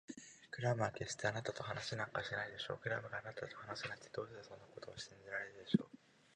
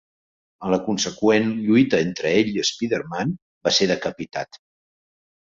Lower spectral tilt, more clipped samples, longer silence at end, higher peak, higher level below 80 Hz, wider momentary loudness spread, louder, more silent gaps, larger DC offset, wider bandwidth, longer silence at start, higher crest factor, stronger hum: about the same, -5 dB/octave vs -4.5 dB/octave; neither; second, 0.4 s vs 0.85 s; second, -18 dBFS vs -4 dBFS; second, -74 dBFS vs -58 dBFS; about the same, 14 LU vs 12 LU; second, -43 LUFS vs -21 LUFS; second, none vs 3.42-3.61 s; neither; first, 10 kHz vs 7.6 kHz; second, 0.1 s vs 0.6 s; first, 26 dB vs 18 dB; neither